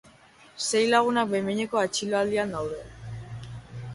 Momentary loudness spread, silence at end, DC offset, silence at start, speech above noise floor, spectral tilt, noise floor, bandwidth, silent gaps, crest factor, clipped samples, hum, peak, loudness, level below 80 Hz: 19 LU; 0 s; under 0.1%; 0.05 s; 29 dB; -4 dB/octave; -54 dBFS; 11.5 kHz; none; 20 dB; under 0.1%; none; -8 dBFS; -25 LUFS; -56 dBFS